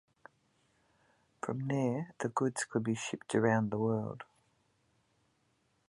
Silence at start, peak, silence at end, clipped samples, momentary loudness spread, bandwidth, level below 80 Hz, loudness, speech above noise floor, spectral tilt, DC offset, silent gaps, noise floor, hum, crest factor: 1.45 s; -14 dBFS; 1.65 s; under 0.1%; 13 LU; 11.5 kHz; -74 dBFS; -34 LUFS; 42 dB; -6 dB/octave; under 0.1%; none; -75 dBFS; none; 22 dB